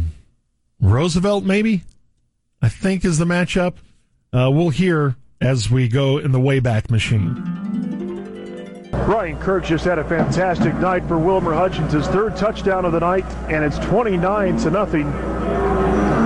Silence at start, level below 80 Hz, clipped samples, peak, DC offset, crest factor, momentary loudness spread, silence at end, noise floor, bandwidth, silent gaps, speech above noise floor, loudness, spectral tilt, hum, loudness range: 0 s; -34 dBFS; under 0.1%; -6 dBFS; under 0.1%; 12 dB; 7 LU; 0 s; -65 dBFS; 11.5 kHz; none; 47 dB; -19 LUFS; -7 dB/octave; none; 2 LU